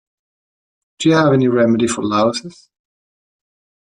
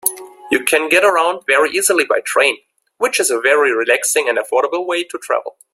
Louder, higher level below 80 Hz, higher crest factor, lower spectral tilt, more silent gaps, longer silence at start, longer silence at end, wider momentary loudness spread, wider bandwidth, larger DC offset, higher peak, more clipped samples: about the same, -15 LUFS vs -15 LUFS; about the same, -58 dBFS vs -62 dBFS; about the same, 16 dB vs 16 dB; first, -5.5 dB/octave vs -0.5 dB/octave; neither; first, 1 s vs 0.05 s; first, 1.4 s vs 0.25 s; about the same, 6 LU vs 8 LU; second, 11 kHz vs 16 kHz; neither; about the same, -2 dBFS vs 0 dBFS; neither